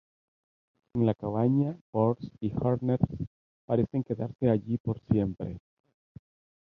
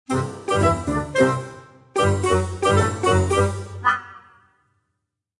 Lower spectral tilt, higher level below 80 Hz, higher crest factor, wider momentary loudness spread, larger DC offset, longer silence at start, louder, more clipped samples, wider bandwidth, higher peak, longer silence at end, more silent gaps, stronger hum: first, -11.5 dB/octave vs -5.5 dB/octave; second, -52 dBFS vs -46 dBFS; about the same, 20 dB vs 18 dB; first, 11 LU vs 7 LU; neither; first, 0.95 s vs 0.1 s; second, -29 LUFS vs -21 LUFS; neither; second, 4.8 kHz vs 11.5 kHz; second, -10 dBFS vs -4 dBFS; second, 1.05 s vs 1.2 s; first, 1.81-1.93 s, 3.27-3.68 s, 4.35-4.39 s, 4.80-4.85 s vs none; neither